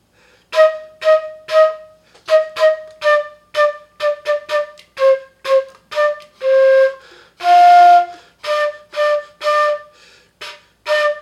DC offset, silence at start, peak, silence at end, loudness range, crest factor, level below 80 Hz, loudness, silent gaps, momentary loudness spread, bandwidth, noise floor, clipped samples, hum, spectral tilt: under 0.1%; 0.5 s; 0 dBFS; 0 s; 5 LU; 14 dB; -66 dBFS; -15 LUFS; none; 16 LU; 12.5 kHz; -53 dBFS; under 0.1%; none; -1 dB/octave